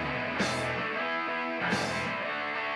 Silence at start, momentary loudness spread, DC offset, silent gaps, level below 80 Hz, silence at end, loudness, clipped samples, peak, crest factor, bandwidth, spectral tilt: 0 s; 2 LU; under 0.1%; none; -60 dBFS; 0 s; -30 LUFS; under 0.1%; -16 dBFS; 16 dB; 14 kHz; -4 dB/octave